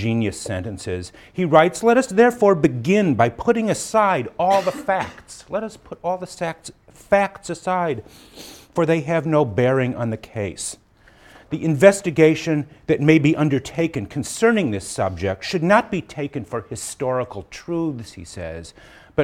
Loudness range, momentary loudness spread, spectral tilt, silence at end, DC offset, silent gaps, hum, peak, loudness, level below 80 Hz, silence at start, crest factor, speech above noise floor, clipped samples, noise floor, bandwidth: 7 LU; 16 LU; -6 dB/octave; 0 s; under 0.1%; none; none; 0 dBFS; -20 LUFS; -50 dBFS; 0 s; 20 dB; 30 dB; under 0.1%; -50 dBFS; 16 kHz